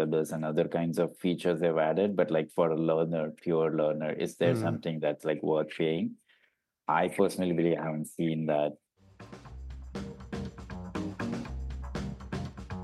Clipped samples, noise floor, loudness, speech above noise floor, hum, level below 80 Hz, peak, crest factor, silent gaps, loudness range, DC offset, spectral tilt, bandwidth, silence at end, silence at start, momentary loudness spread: under 0.1%; -73 dBFS; -31 LUFS; 44 dB; none; -50 dBFS; -12 dBFS; 18 dB; none; 10 LU; under 0.1%; -7 dB/octave; 12.5 kHz; 0 s; 0 s; 14 LU